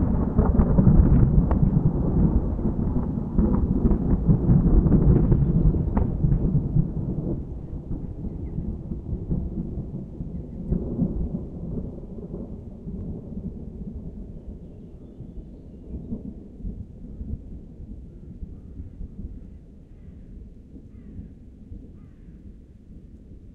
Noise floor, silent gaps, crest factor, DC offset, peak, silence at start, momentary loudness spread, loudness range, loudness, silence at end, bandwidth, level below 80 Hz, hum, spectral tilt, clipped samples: -45 dBFS; none; 20 dB; under 0.1%; -4 dBFS; 0 s; 24 LU; 21 LU; -24 LUFS; 0.05 s; 2.4 kHz; -28 dBFS; none; -13 dB/octave; under 0.1%